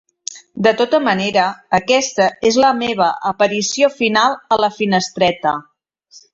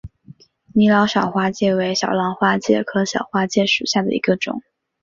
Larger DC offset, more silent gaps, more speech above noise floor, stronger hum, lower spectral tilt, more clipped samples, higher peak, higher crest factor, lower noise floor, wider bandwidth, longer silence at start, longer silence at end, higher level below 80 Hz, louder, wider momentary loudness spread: neither; neither; first, 33 dB vs 28 dB; neither; second, -3.5 dB/octave vs -5 dB/octave; neither; about the same, -2 dBFS vs -2 dBFS; about the same, 16 dB vs 16 dB; about the same, -48 dBFS vs -46 dBFS; about the same, 8 kHz vs 7.6 kHz; first, 0.3 s vs 0.05 s; first, 0.7 s vs 0.45 s; about the same, -56 dBFS vs -54 dBFS; about the same, -16 LUFS vs -18 LUFS; about the same, 6 LU vs 6 LU